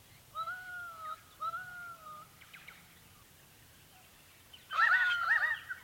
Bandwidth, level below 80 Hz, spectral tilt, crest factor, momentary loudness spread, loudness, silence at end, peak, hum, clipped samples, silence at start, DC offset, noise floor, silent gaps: 17 kHz; -72 dBFS; -1 dB/octave; 20 dB; 25 LU; -32 LUFS; 0 s; -18 dBFS; none; under 0.1%; 0.1 s; under 0.1%; -60 dBFS; none